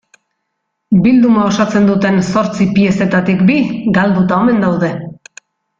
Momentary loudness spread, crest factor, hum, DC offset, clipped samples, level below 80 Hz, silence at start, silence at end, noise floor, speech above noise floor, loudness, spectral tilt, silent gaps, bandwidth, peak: 5 LU; 12 dB; none; under 0.1%; under 0.1%; -46 dBFS; 0.9 s; 0.65 s; -71 dBFS; 60 dB; -12 LUFS; -7 dB/octave; none; 7.6 kHz; -2 dBFS